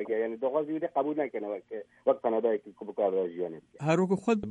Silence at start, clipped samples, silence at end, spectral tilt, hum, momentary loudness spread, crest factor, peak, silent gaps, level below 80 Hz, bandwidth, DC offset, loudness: 0 s; under 0.1%; 0 s; -7.5 dB/octave; none; 10 LU; 18 dB; -12 dBFS; none; -72 dBFS; 10.5 kHz; under 0.1%; -30 LUFS